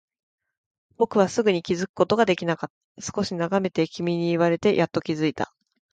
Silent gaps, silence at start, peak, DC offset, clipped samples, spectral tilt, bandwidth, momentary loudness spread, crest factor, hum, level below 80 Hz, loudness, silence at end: 1.89-1.94 s, 2.70-2.95 s; 1 s; -6 dBFS; under 0.1%; under 0.1%; -5.5 dB/octave; 9.2 kHz; 10 LU; 20 dB; none; -60 dBFS; -24 LUFS; 0.45 s